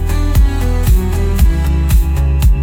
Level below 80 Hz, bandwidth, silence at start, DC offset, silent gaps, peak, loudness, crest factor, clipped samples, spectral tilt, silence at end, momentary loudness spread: -12 dBFS; 17.5 kHz; 0 s; under 0.1%; none; -2 dBFS; -14 LUFS; 10 dB; under 0.1%; -6.5 dB/octave; 0 s; 2 LU